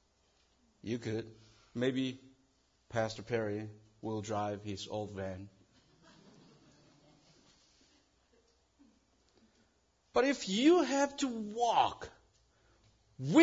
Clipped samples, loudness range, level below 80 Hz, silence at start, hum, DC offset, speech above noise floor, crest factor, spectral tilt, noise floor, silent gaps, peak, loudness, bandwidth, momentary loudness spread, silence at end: under 0.1%; 13 LU; -72 dBFS; 0.85 s; none; under 0.1%; 40 dB; 24 dB; -4.5 dB/octave; -73 dBFS; none; -12 dBFS; -34 LUFS; 7.4 kHz; 20 LU; 0 s